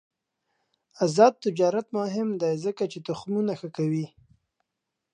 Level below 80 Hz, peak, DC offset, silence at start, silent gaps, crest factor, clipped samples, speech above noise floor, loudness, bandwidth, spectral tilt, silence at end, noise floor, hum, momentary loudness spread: -74 dBFS; -4 dBFS; under 0.1%; 1 s; none; 24 dB; under 0.1%; 59 dB; -26 LUFS; 10 kHz; -6.5 dB/octave; 1.05 s; -84 dBFS; none; 11 LU